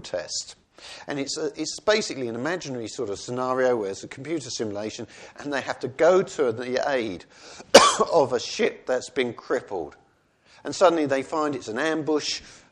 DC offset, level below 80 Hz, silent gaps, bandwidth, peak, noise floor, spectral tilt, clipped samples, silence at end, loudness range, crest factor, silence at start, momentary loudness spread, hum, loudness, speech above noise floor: under 0.1%; -62 dBFS; none; 11.5 kHz; 0 dBFS; -61 dBFS; -3 dB/octave; under 0.1%; 0.15 s; 7 LU; 24 dB; 0.05 s; 16 LU; none; -24 LUFS; 37 dB